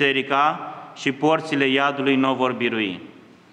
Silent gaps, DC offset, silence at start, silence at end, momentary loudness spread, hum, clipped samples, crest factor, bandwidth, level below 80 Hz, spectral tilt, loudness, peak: none; under 0.1%; 0 s; 0.4 s; 9 LU; none; under 0.1%; 18 dB; 9.4 kHz; -74 dBFS; -5 dB/octave; -21 LUFS; -4 dBFS